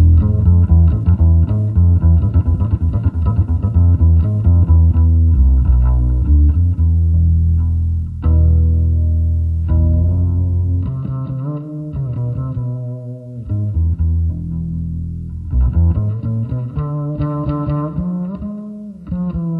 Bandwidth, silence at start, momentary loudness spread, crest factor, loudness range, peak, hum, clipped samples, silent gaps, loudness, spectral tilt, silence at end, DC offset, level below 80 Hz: 1.6 kHz; 0 s; 11 LU; 12 dB; 8 LU; -2 dBFS; none; under 0.1%; none; -16 LUFS; -12.5 dB/octave; 0 s; under 0.1%; -18 dBFS